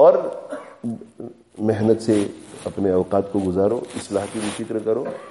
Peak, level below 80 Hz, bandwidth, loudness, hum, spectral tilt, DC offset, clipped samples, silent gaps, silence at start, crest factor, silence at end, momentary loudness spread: -2 dBFS; -58 dBFS; 11.5 kHz; -22 LUFS; none; -6.5 dB/octave; under 0.1%; under 0.1%; none; 0 s; 18 dB; 0 s; 14 LU